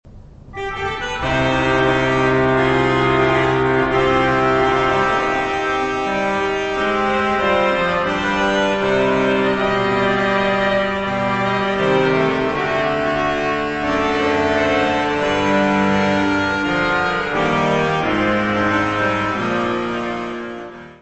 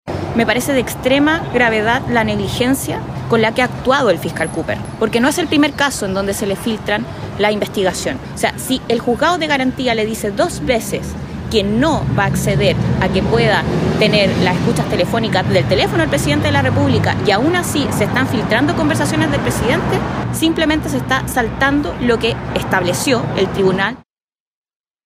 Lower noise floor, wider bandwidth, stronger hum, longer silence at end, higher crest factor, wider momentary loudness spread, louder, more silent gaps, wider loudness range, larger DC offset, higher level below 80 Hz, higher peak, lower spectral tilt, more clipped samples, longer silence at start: second, -39 dBFS vs under -90 dBFS; second, 8.4 kHz vs 16 kHz; neither; second, 0.05 s vs 1.05 s; about the same, 14 dB vs 14 dB; about the same, 4 LU vs 6 LU; about the same, -17 LUFS vs -16 LUFS; neither; about the same, 2 LU vs 3 LU; neither; second, -40 dBFS vs -34 dBFS; about the same, -4 dBFS vs -2 dBFS; about the same, -5.5 dB/octave vs -5 dB/octave; neither; about the same, 0.05 s vs 0.05 s